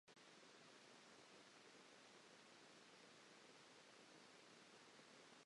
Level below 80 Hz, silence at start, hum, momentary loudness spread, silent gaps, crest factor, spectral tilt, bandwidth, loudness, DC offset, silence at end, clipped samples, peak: under -90 dBFS; 0.05 s; none; 0 LU; none; 14 dB; -2 dB/octave; 11 kHz; -66 LUFS; under 0.1%; 0 s; under 0.1%; -52 dBFS